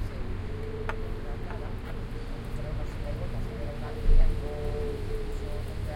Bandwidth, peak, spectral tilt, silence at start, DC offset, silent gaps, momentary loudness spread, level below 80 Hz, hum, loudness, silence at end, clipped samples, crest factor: 5.4 kHz; -10 dBFS; -7 dB/octave; 0 s; under 0.1%; none; 8 LU; -30 dBFS; none; -35 LUFS; 0 s; under 0.1%; 18 dB